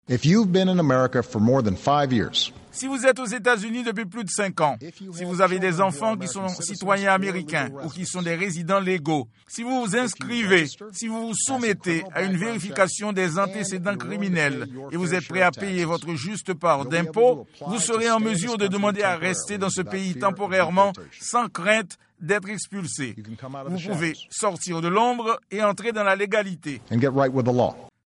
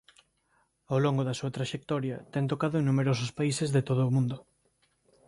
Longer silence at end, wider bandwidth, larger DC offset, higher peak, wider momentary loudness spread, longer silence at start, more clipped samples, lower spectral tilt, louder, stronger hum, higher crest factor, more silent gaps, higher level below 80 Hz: second, 0.2 s vs 0.85 s; about the same, 11.5 kHz vs 11.5 kHz; neither; first, -4 dBFS vs -14 dBFS; first, 10 LU vs 7 LU; second, 0.1 s vs 0.9 s; neither; second, -4.5 dB/octave vs -6.5 dB/octave; first, -23 LUFS vs -29 LUFS; neither; about the same, 20 dB vs 16 dB; neither; about the same, -62 dBFS vs -64 dBFS